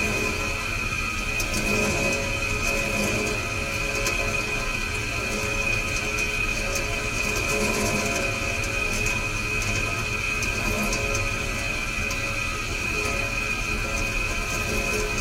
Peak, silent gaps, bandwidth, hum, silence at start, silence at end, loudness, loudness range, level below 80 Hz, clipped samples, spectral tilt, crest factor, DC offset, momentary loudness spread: -12 dBFS; none; 16 kHz; none; 0 s; 0 s; -24 LUFS; 1 LU; -34 dBFS; under 0.1%; -3 dB/octave; 14 dB; under 0.1%; 3 LU